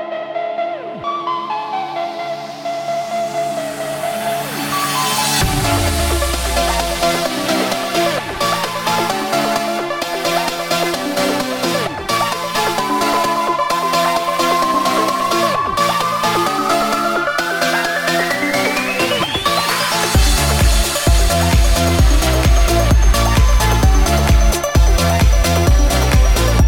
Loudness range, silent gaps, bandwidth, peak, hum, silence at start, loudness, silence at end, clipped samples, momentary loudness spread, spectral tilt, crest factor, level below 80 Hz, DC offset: 5 LU; none; 18.5 kHz; 0 dBFS; none; 0 s; -16 LUFS; 0 s; under 0.1%; 8 LU; -4 dB/octave; 14 dB; -20 dBFS; under 0.1%